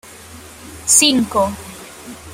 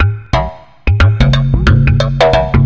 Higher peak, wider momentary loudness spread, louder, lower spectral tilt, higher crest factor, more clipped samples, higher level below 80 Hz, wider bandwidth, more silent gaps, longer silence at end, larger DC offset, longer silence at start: about the same, 0 dBFS vs 0 dBFS; first, 26 LU vs 7 LU; about the same, -14 LUFS vs -12 LUFS; second, -1.5 dB/octave vs -7 dB/octave; first, 20 dB vs 10 dB; neither; second, -48 dBFS vs -16 dBFS; first, 16.5 kHz vs 7.6 kHz; neither; about the same, 0 s vs 0 s; neither; about the same, 0.1 s vs 0 s